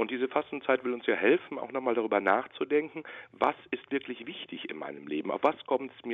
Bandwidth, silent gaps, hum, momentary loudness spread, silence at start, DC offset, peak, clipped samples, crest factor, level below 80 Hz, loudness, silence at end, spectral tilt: 5.4 kHz; none; none; 13 LU; 0 s; under 0.1%; -10 dBFS; under 0.1%; 20 dB; -76 dBFS; -31 LUFS; 0 s; -7 dB/octave